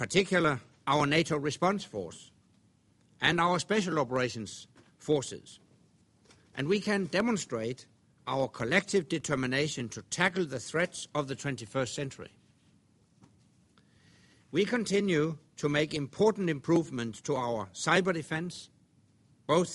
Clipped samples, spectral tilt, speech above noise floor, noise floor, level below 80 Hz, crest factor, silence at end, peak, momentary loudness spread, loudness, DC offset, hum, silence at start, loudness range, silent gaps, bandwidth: under 0.1%; -4.5 dB/octave; 36 dB; -66 dBFS; -66 dBFS; 22 dB; 0 s; -10 dBFS; 13 LU; -30 LUFS; under 0.1%; none; 0 s; 6 LU; none; 11.5 kHz